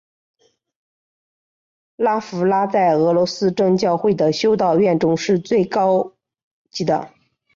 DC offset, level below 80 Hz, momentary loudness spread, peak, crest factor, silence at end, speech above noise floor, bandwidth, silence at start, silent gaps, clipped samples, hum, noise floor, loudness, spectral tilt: under 0.1%; -60 dBFS; 6 LU; -6 dBFS; 12 dB; 0.5 s; over 73 dB; 7.6 kHz; 2 s; 6.43-6.65 s; under 0.1%; none; under -90 dBFS; -18 LUFS; -6 dB/octave